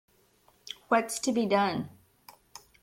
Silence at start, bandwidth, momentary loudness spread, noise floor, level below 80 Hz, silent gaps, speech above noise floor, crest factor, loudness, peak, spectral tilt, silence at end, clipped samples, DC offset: 0.65 s; 16.5 kHz; 24 LU; -65 dBFS; -70 dBFS; none; 38 dB; 18 dB; -28 LUFS; -12 dBFS; -4 dB/octave; 0.95 s; under 0.1%; under 0.1%